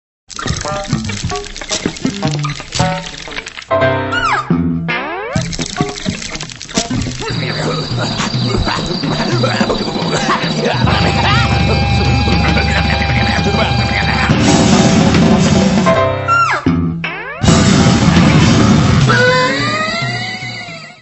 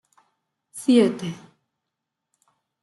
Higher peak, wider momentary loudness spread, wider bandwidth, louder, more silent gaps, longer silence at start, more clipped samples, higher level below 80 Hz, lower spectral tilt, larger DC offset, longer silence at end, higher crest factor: first, 0 dBFS vs -6 dBFS; second, 11 LU vs 23 LU; second, 8.4 kHz vs 12 kHz; first, -13 LUFS vs -21 LUFS; neither; second, 0.3 s vs 0.75 s; neither; first, -26 dBFS vs -72 dBFS; about the same, -5 dB/octave vs -5.5 dB/octave; neither; second, 0.05 s vs 1.5 s; second, 14 dB vs 20 dB